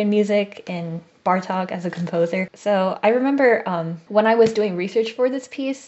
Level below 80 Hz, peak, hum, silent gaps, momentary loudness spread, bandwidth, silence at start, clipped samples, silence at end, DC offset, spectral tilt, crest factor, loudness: -70 dBFS; -4 dBFS; none; none; 10 LU; 8.2 kHz; 0 s; under 0.1%; 0 s; under 0.1%; -6.5 dB/octave; 16 dB; -21 LUFS